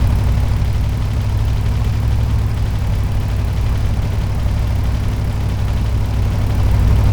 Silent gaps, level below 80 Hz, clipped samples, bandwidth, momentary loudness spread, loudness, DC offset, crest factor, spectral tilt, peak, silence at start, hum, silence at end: none; -18 dBFS; under 0.1%; 19.5 kHz; 3 LU; -18 LUFS; under 0.1%; 12 dB; -7 dB/octave; -4 dBFS; 0 s; none; 0 s